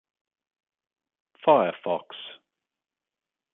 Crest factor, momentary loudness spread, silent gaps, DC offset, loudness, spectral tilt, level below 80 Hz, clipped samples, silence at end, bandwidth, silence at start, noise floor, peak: 24 dB; 20 LU; none; under 0.1%; -24 LUFS; -3 dB/octave; -80 dBFS; under 0.1%; 1.25 s; 4 kHz; 1.45 s; -90 dBFS; -4 dBFS